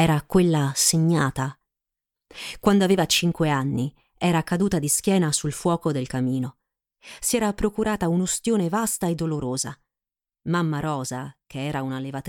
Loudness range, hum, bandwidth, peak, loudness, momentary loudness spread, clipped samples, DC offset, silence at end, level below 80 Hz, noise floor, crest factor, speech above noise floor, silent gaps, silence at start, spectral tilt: 4 LU; none; 18.5 kHz; -6 dBFS; -23 LUFS; 12 LU; under 0.1%; under 0.1%; 0 s; -48 dBFS; under -90 dBFS; 18 dB; over 67 dB; none; 0 s; -4.5 dB/octave